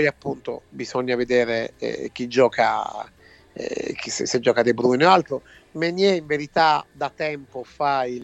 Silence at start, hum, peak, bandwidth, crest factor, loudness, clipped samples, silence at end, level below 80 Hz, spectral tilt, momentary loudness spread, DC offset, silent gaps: 0 s; none; -2 dBFS; 8.4 kHz; 20 dB; -22 LUFS; under 0.1%; 0 s; -58 dBFS; -4.5 dB/octave; 15 LU; under 0.1%; none